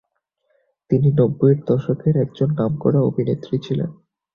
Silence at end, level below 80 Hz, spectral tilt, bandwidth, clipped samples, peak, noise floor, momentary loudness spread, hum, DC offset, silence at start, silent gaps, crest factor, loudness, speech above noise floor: 0.4 s; -52 dBFS; -11 dB/octave; 5.2 kHz; under 0.1%; -4 dBFS; -70 dBFS; 8 LU; none; under 0.1%; 0.9 s; none; 16 dB; -19 LUFS; 52 dB